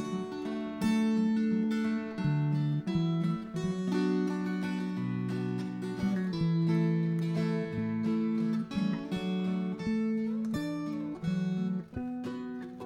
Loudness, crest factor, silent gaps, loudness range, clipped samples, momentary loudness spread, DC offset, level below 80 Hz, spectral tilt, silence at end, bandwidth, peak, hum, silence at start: -32 LUFS; 12 dB; none; 3 LU; under 0.1%; 8 LU; under 0.1%; -62 dBFS; -8 dB/octave; 0 s; 11.5 kHz; -18 dBFS; none; 0 s